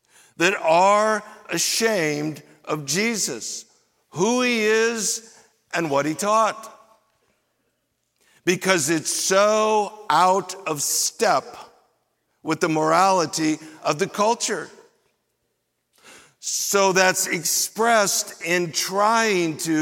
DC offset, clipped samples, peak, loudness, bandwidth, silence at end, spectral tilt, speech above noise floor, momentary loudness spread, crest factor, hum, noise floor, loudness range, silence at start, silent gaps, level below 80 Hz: under 0.1%; under 0.1%; -2 dBFS; -21 LUFS; 17 kHz; 0 s; -2.5 dB/octave; 53 dB; 11 LU; 20 dB; none; -74 dBFS; 5 LU; 0.4 s; none; -74 dBFS